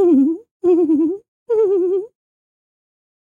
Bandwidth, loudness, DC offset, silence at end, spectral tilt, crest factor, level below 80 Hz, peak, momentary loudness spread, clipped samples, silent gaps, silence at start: 3.4 kHz; -17 LUFS; under 0.1%; 1.3 s; -9 dB/octave; 12 dB; -70 dBFS; -6 dBFS; 9 LU; under 0.1%; 0.51-0.60 s, 1.28-1.46 s; 0 s